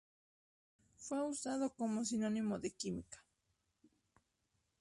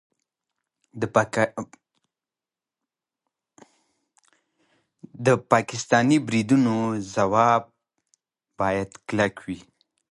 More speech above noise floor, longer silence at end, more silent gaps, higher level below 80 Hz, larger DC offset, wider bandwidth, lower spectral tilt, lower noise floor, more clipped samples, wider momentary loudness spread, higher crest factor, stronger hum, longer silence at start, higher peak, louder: second, 44 dB vs over 68 dB; first, 1.6 s vs 0.5 s; neither; second, -74 dBFS vs -60 dBFS; neither; about the same, 11.5 kHz vs 11.5 kHz; about the same, -4.5 dB/octave vs -5.5 dB/octave; second, -84 dBFS vs under -90 dBFS; neither; about the same, 13 LU vs 13 LU; second, 16 dB vs 24 dB; neither; about the same, 1 s vs 0.95 s; second, -28 dBFS vs -2 dBFS; second, -40 LUFS vs -23 LUFS